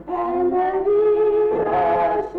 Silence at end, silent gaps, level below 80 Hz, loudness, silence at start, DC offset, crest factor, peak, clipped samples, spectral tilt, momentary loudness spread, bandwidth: 0 s; none; -48 dBFS; -19 LUFS; 0 s; under 0.1%; 8 dB; -12 dBFS; under 0.1%; -8.5 dB/octave; 3 LU; 4.5 kHz